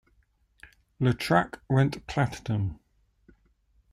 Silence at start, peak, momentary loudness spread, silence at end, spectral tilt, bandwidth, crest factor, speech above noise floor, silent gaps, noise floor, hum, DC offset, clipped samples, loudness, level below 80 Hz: 0.65 s; -10 dBFS; 6 LU; 1.2 s; -7 dB/octave; 14.5 kHz; 20 dB; 41 dB; none; -67 dBFS; none; under 0.1%; under 0.1%; -27 LUFS; -54 dBFS